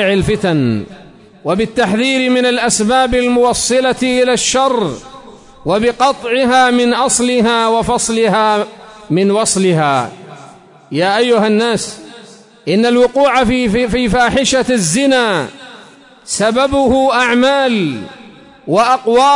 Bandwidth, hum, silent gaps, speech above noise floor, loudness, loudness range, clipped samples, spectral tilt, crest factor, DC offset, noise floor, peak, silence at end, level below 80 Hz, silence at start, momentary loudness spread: 11 kHz; none; none; 28 dB; -12 LUFS; 2 LU; under 0.1%; -4 dB/octave; 12 dB; under 0.1%; -40 dBFS; 0 dBFS; 0 s; -38 dBFS; 0 s; 9 LU